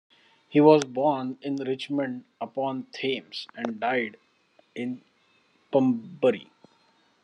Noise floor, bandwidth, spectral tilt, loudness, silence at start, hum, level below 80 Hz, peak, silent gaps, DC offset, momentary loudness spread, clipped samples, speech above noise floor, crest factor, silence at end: -65 dBFS; 10 kHz; -6 dB/octave; -26 LUFS; 0.5 s; none; -82 dBFS; -4 dBFS; none; under 0.1%; 16 LU; under 0.1%; 40 dB; 24 dB; 0.8 s